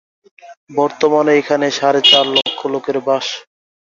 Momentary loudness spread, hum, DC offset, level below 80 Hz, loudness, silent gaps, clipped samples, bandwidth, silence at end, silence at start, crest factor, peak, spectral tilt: 12 LU; none; under 0.1%; -62 dBFS; -14 LUFS; 0.57-0.67 s; under 0.1%; 7.8 kHz; 0.55 s; 0.45 s; 16 dB; 0 dBFS; -3 dB/octave